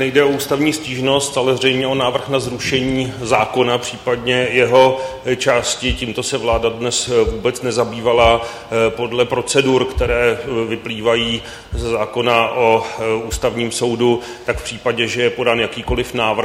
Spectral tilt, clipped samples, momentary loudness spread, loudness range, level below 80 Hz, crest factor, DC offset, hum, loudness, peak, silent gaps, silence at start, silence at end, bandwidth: -4 dB/octave; under 0.1%; 7 LU; 2 LU; -34 dBFS; 16 dB; under 0.1%; none; -17 LUFS; 0 dBFS; none; 0 s; 0 s; 16.5 kHz